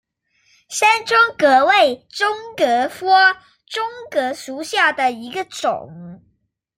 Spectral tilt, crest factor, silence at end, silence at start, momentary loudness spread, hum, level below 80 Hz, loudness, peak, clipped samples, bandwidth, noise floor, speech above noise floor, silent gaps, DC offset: -2 dB/octave; 16 dB; 0.6 s; 0.7 s; 15 LU; none; -66 dBFS; -17 LUFS; -2 dBFS; under 0.1%; 16 kHz; -66 dBFS; 48 dB; none; under 0.1%